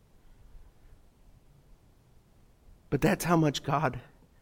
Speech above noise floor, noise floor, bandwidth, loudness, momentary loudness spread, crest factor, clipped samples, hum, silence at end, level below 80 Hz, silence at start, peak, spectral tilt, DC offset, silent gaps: 33 dB; -60 dBFS; 16.5 kHz; -28 LUFS; 9 LU; 22 dB; under 0.1%; none; 0.4 s; -54 dBFS; 0.55 s; -12 dBFS; -6 dB/octave; under 0.1%; none